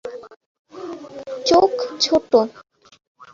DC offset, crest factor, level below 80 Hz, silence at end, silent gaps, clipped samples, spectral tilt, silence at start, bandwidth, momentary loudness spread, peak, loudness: under 0.1%; 18 dB; -56 dBFS; 0.75 s; 0.46-0.65 s; under 0.1%; -3.5 dB/octave; 0.05 s; 7.8 kHz; 20 LU; -2 dBFS; -18 LUFS